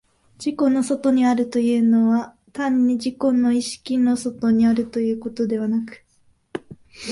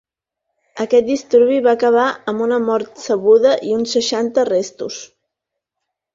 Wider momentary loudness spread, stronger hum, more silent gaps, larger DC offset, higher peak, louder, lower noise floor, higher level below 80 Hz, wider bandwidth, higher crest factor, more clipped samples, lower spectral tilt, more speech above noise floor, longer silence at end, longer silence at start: first, 16 LU vs 12 LU; neither; neither; neither; second, -6 dBFS vs -2 dBFS; second, -20 LUFS vs -16 LUFS; second, -54 dBFS vs -81 dBFS; about the same, -58 dBFS vs -62 dBFS; first, 11.5 kHz vs 7.6 kHz; about the same, 14 dB vs 14 dB; neither; first, -5.5 dB/octave vs -4 dB/octave; second, 34 dB vs 65 dB; second, 0 s vs 1.1 s; second, 0.4 s vs 0.75 s